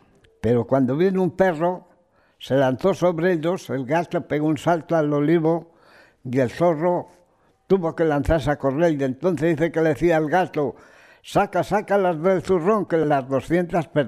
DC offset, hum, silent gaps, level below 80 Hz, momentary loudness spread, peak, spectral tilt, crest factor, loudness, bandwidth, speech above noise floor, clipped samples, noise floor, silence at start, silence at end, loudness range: under 0.1%; none; none; -46 dBFS; 6 LU; -6 dBFS; -7.5 dB/octave; 14 dB; -21 LUFS; 15 kHz; 40 dB; under 0.1%; -61 dBFS; 0.45 s; 0 s; 2 LU